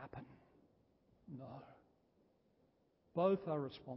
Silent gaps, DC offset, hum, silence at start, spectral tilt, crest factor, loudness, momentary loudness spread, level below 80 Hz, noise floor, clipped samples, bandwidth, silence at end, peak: none; under 0.1%; none; 0 s; -7 dB/octave; 22 dB; -39 LUFS; 20 LU; -78 dBFS; -76 dBFS; under 0.1%; 5.6 kHz; 0 s; -22 dBFS